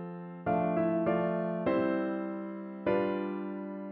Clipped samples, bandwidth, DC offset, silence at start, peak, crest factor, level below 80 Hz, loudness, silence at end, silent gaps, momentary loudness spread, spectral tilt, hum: under 0.1%; 4.5 kHz; under 0.1%; 0 s; -16 dBFS; 16 dB; -66 dBFS; -32 LUFS; 0 s; none; 10 LU; -11 dB/octave; none